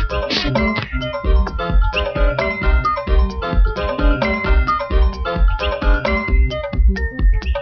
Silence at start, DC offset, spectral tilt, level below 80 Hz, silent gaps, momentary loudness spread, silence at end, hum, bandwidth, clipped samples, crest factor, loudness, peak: 0 s; 0.1%; -7 dB/octave; -18 dBFS; none; 2 LU; 0 s; none; 6.2 kHz; under 0.1%; 14 dB; -19 LUFS; -2 dBFS